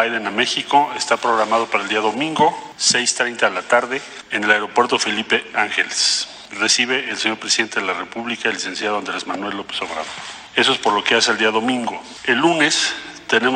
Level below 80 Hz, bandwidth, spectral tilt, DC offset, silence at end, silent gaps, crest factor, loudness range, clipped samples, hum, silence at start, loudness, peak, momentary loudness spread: -62 dBFS; 11.5 kHz; -1.5 dB/octave; under 0.1%; 0 s; none; 18 dB; 4 LU; under 0.1%; none; 0 s; -18 LUFS; -2 dBFS; 10 LU